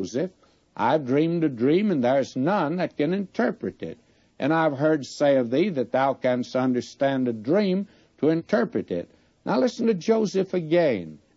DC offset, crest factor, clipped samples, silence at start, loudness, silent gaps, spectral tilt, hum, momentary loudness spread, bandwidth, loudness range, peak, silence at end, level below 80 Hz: under 0.1%; 14 dB; under 0.1%; 0 s; -24 LUFS; none; -7 dB/octave; none; 10 LU; 8 kHz; 2 LU; -10 dBFS; 0.2 s; -68 dBFS